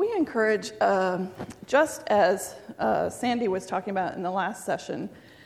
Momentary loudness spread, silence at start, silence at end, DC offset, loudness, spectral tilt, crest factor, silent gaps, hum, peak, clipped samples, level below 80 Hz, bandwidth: 12 LU; 0 s; 0.25 s; under 0.1%; -26 LUFS; -4.5 dB/octave; 18 dB; none; none; -10 dBFS; under 0.1%; -62 dBFS; 15.5 kHz